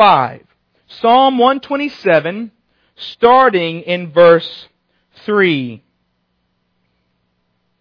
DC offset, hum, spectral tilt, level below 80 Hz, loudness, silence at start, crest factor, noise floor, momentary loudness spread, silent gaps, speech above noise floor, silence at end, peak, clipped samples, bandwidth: under 0.1%; none; -7.5 dB/octave; -58 dBFS; -13 LUFS; 0 s; 14 dB; -66 dBFS; 20 LU; none; 53 dB; 2.05 s; 0 dBFS; under 0.1%; 5.4 kHz